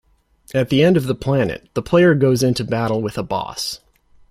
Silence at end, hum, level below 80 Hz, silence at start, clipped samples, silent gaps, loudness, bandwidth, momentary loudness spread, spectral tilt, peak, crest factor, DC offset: 0.55 s; none; -46 dBFS; 0.55 s; under 0.1%; none; -18 LUFS; 16 kHz; 11 LU; -6 dB/octave; -2 dBFS; 16 dB; under 0.1%